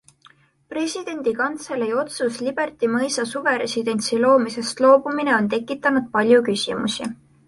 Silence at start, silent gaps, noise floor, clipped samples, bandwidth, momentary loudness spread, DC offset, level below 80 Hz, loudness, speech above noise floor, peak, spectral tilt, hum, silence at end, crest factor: 0.7 s; none; -55 dBFS; under 0.1%; 11.5 kHz; 9 LU; under 0.1%; -62 dBFS; -21 LUFS; 34 dB; -2 dBFS; -4 dB/octave; none; 0.35 s; 18 dB